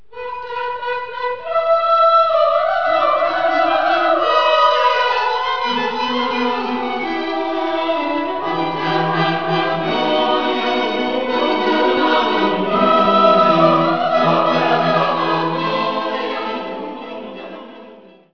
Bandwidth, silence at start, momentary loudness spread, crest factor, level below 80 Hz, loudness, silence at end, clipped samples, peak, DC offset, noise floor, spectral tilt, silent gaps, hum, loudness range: 5.4 kHz; 0.15 s; 11 LU; 16 dB; -56 dBFS; -16 LUFS; 0 s; under 0.1%; -2 dBFS; 1%; -42 dBFS; -6 dB/octave; none; none; 5 LU